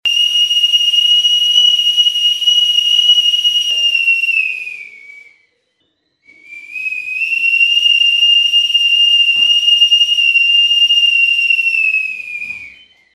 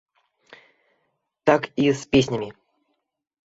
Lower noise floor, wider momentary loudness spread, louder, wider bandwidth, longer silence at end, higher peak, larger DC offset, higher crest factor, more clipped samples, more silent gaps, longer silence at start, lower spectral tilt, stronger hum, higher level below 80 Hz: second, -64 dBFS vs -76 dBFS; first, 12 LU vs 9 LU; first, -9 LUFS vs -22 LUFS; first, 15.5 kHz vs 8 kHz; second, 0.45 s vs 0.95 s; about the same, 0 dBFS vs -2 dBFS; neither; second, 12 dB vs 22 dB; neither; neither; second, 0.05 s vs 1.45 s; second, 4.5 dB/octave vs -5.5 dB/octave; neither; second, -70 dBFS vs -54 dBFS